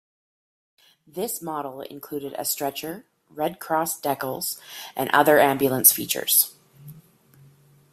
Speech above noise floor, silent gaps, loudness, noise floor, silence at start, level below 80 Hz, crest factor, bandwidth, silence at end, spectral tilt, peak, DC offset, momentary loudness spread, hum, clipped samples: 31 dB; none; -22 LUFS; -55 dBFS; 1.15 s; -68 dBFS; 26 dB; 16 kHz; 0.9 s; -2.5 dB/octave; 0 dBFS; under 0.1%; 18 LU; none; under 0.1%